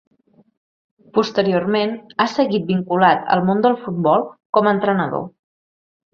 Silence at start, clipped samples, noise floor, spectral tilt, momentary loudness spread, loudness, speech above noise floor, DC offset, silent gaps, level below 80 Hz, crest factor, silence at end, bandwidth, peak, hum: 1.15 s; under 0.1%; under -90 dBFS; -7 dB/octave; 7 LU; -18 LUFS; over 73 dB; under 0.1%; 4.45-4.53 s; -62 dBFS; 18 dB; 0.85 s; 7 kHz; -2 dBFS; none